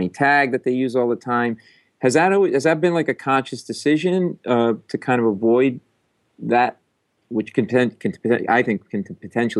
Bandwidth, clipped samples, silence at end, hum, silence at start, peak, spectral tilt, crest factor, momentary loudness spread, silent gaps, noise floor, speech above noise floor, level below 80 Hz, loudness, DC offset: 12 kHz; under 0.1%; 0 s; none; 0 s; -4 dBFS; -6 dB/octave; 16 dB; 10 LU; none; -68 dBFS; 49 dB; -70 dBFS; -20 LUFS; under 0.1%